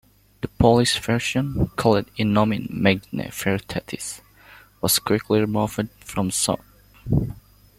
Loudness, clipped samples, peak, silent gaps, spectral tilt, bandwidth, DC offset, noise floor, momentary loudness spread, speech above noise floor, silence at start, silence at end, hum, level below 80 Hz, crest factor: -22 LUFS; under 0.1%; -2 dBFS; none; -4.5 dB/octave; 16.5 kHz; under 0.1%; -49 dBFS; 12 LU; 28 dB; 0.45 s; 0.4 s; none; -42 dBFS; 22 dB